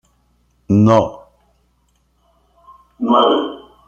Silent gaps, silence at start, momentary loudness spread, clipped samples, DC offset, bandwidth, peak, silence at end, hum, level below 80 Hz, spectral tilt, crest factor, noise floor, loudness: none; 0.7 s; 13 LU; under 0.1%; under 0.1%; 7.6 kHz; -2 dBFS; 0.3 s; none; -52 dBFS; -7.5 dB/octave; 18 dB; -61 dBFS; -15 LUFS